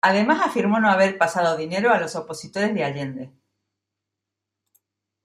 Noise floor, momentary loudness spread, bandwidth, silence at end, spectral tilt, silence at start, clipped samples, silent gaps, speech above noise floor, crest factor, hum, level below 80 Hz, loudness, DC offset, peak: -84 dBFS; 14 LU; 13 kHz; 1.95 s; -5 dB/octave; 0.05 s; under 0.1%; none; 63 dB; 20 dB; none; -70 dBFS; -21 LUFS; under 0.1%; -4 dBFS